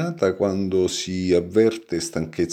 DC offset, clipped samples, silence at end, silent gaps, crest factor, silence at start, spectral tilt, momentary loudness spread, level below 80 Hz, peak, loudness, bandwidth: under 0.1%; under 0.1%; 0 s; none; 16 dB; 0 s; -5.5 dB/octave; 7 LU; -52 dBFS; -6 dBFS; -22 LUFS; 15 kHz